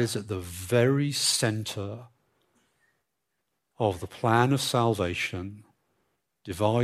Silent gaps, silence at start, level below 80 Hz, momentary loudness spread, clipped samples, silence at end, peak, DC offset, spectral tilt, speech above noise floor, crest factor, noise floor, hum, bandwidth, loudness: none; 0 s; -64 dBFS; 15 LU; under 0.1%; 0 s; -8 dBFS; under 0.1%; -4.5 dB/octave; 55 dB; 20 dB; -81 dBFS; none; 15.5 kHz; -26 LUFS